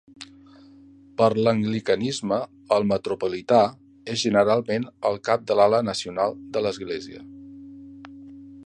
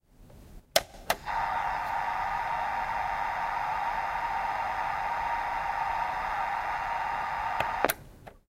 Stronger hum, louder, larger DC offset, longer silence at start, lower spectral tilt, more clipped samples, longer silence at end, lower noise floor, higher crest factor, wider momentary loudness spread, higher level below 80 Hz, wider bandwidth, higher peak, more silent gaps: neither; first, -23 LUFS vs -31 LUFS; neither; about the same, 0.2 s vs 0.2 s; first, -5.5 dB/octave vs -2 dB/octave; neither; about the same, 0.05 s vs 0.1 s; about the same, -50 dBFS vs -53 dBFS; second, 20 dB vs 26 dB; first, 24 LU vs 2 LU; second, -60 dBFS vs -52 dBFS; second, 10.5 kHz vs 16 kHz; about the same, -4 dBFS vs -6 dBFS; neither